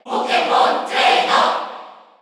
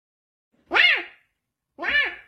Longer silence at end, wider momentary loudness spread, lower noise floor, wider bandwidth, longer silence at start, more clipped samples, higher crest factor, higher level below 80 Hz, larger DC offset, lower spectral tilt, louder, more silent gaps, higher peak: first, 0.3 s vs 0.1 s; about the same, 13 LU vs 14 LU; second, -38 dBFS vs -79 dBFS; about the same, 12 kHz vs 13 kHz; second, 0.05 s vs 0.7 s; neither; about the same, 16 dB vs 20 dB; second, -84 dBFS vs -60 dBFS; neither; about the same, -1.5 dB/octave vs -1.5 dB/octave; first, -16 LUFS vs -20 LUFS; neither; first, -2 dBFS vs -6 dBFS